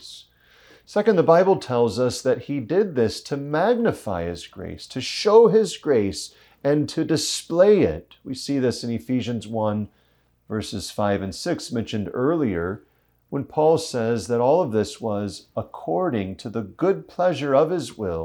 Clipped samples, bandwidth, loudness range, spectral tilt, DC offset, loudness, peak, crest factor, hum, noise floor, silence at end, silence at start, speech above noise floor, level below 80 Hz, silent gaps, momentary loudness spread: under 0.1%; 13 kHz; 6 LU; -5.5 dB/octave; under 0.1%; -22 LUFS; -2 dBFS; 20 dB; none; -63 dBFS; 0 s; 0 s; 41 dB; -56 dBFS; none; 14 LU